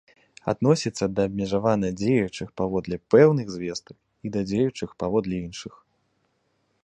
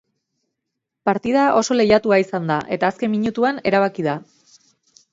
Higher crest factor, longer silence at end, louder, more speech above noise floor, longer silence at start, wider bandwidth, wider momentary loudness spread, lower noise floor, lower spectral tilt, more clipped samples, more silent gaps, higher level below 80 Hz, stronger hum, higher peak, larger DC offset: about the same, 22 dB vs 18 dB; first, 1.15 s vs 0.9 s; second, -24 LUFS vs -19 LUFS; second, 47 dB vs 62 dB; second, 0.45 s vs 1.05 s; first, 9.2 kHz vs 7.8 kHz; first, 15 LU vs 8 LU; second, -71 dBFS vs -80 dBFS; about the same, -6.5 dB/octave vs -5.5 dB/octave; neither; neither; first, -52 dBFS vs -58 dBFS; neither; about the same, -4 dBFS vs -2 dBFS; neither